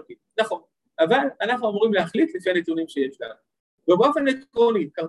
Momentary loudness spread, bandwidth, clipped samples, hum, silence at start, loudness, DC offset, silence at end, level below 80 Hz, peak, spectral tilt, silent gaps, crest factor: 11 LU; 11.5 kHz; under 0.1%; none; 0.1 s; -22 LUFS; under 0.1%; 0 s; -70 dBFS; -6 dBFS; -6 dB/octave; 3.60-3.78 s; 18 dB